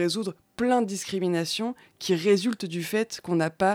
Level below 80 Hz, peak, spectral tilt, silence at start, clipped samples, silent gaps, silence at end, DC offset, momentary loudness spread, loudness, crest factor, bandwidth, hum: -66 dBFS; -10 dBFS; -5 dB/octave; 0 s; under 0.1%; none; 0 s; under 0.1%; 8 LU; -27 LUFS; 16 dB; 17.5 kHz; none